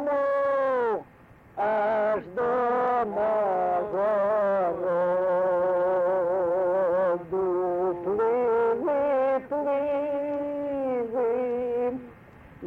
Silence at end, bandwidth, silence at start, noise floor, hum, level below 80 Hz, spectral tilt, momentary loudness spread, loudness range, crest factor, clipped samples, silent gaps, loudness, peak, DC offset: 0 s; 4.7 kHz; 0 s; -52 dBFS; none; -62 dBFS; -8 dB/octave; 5 LU; 2 LU; 8 dB; under 0.1%; none; -26 LUFS; -18 dBFS; under 0.1%